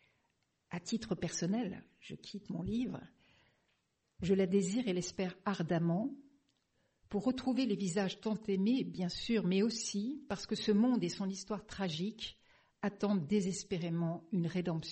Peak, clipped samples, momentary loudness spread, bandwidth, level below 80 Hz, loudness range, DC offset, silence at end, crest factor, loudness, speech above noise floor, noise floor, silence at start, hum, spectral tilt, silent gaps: -20 dBFS; under 0.1%; 11 LU; 8.4 kHz; -66 dBFS; 6 LU; under 0.1%; 0 s; 16 dB; -36 LUFS; 45 dB; -80 dBFS; 0.7 s; none; -5.5 dB/octave; none